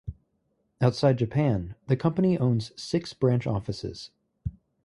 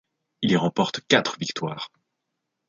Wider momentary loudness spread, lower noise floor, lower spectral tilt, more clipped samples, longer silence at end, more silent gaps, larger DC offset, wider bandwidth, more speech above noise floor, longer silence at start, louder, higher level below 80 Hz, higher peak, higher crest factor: first, 15 LU vs 12 LU; second, -73 dBFS vs -81 dBFS; first, -7.5 dB/octave vs -4.5 dB/octave; neither; second, 0.35 s vs 0.8 s; neither; neither; first, 11 kHz vs 7.6 kHz; second, 48 dB vs 57 dB; second, 0.05 s vs 0.4 s; about the same, -26 LUFS vs -24 LUFS; first, -48 dBFS vs -64 dBFS; second, -8 dBFS vs -2 dBFS; about the same, 20 dB vs 24 dB